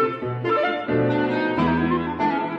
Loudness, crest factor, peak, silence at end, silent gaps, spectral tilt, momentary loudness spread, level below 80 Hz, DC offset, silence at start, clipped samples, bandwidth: -22 LUFS; 12 dB; -8 dBFS; 0 s; none; -8.5 dB/octave; 2 LU; -48 dBFS; under 0.1%; 0 s; under 0.1%; 7.4 kHz